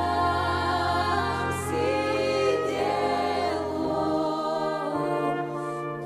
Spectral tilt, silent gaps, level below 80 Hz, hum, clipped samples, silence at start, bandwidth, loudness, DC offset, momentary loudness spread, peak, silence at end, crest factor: -5.5 dB/octave; none; -50 dBFS; none; under 0.1%; 0 s; 15 kHz; -26 LUFS; under 0.1%; 4 LU; -12 dBFS; 0 s; 14 dB